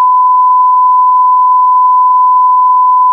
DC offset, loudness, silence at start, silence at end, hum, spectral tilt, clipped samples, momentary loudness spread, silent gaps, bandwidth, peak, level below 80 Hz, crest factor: under 0.1%; -7 LUFS; 0 s; 0 s; none; -3 dB/octave; under 0.1%; 0 LU; none; 1.2 kHz; -2 dBFS; under -90 dBFS; 4 dB